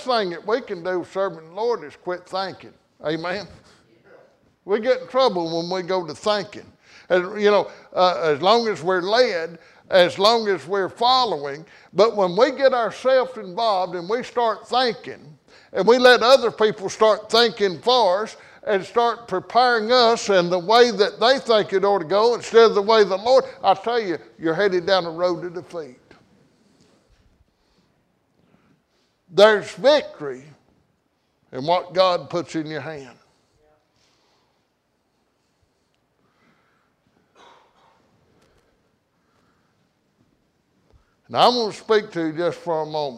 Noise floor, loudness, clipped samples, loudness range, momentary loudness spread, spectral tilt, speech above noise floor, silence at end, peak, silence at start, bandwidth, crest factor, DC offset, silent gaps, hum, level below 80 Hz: -69 dBFS; -20 LUFS; under 0.1%; 10 LU; 15 LU; -4 dB/octave; 49 dB; 0 s; -2 dBFS; 0 s; 12.5 kHz; 20 dB; under 0.1%; none; none; -66 dBFS